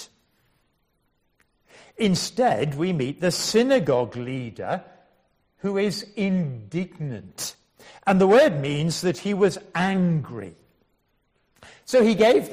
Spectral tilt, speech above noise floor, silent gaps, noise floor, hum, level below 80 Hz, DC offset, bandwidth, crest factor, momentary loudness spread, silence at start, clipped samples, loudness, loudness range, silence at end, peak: -5.5 dB/octave; 48 dB; none; -70 dBFS; none; -60 dBFS; under 0.1%; 15.5 kHz; 18 dB; 15 LU; 0 s; under 0.1%; -23 LUFS; 7 LU; 0 s; -6 dBFS